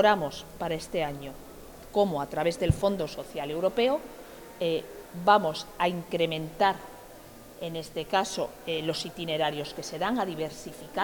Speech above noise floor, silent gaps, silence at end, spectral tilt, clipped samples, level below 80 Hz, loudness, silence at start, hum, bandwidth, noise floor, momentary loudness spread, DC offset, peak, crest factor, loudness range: 20 dB; none; 0 s; -5 dB/octave; under 0.1%; -52 dBFS; -29 LUFS; 0 s; none; 19.5 kHz; -48 dBFS; 18 LU; under 0.1%; -6 dBFS; 22 dB; 3 LU